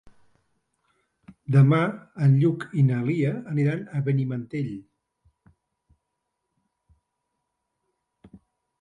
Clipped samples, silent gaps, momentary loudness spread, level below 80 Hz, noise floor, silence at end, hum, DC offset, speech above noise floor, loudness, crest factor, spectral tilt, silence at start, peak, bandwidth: under 0.1%; none; 12 LU; -66 dBFS; -80 dBFS; 4 s; none; under 0.1%; 58 dB; -24 LUFS; 18 dB; -9.5 dB/octave; 1.5 s; -8 dBFS; 5.2 kHz